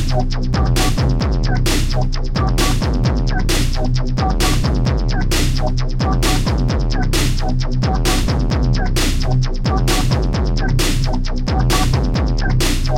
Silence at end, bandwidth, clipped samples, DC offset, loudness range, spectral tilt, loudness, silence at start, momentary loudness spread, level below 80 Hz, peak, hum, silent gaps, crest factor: 0 s; 16.5 kHz; under 0.1%; under 0.1%; 1 LU; -5 dB/octave; -18 LUFS; 0 s; 3 LU; -18 dBFS; -4 dBFS; none; none; 12 dB